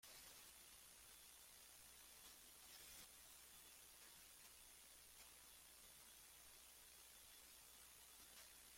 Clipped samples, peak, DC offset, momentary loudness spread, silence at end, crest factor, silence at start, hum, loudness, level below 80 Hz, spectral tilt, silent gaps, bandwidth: under 0.1%; -50 dBFS; under 0.1%; 2 LU; 0 s; 16 dB; 0 s; none; -62 LUFS; -82 dBFS; 0 dB/octave; none; 16.5 kHz